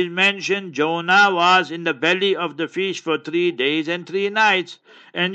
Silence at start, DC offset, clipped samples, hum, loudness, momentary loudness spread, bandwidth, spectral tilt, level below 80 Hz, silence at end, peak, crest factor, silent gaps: 0 s; under 0.1%; under 0.1%; none; -19 LUFS; 9 LU; 8.6 kHz; -4 dB/octave; -74 dBFS; 0 s; -4 dBFS; 16 dB; none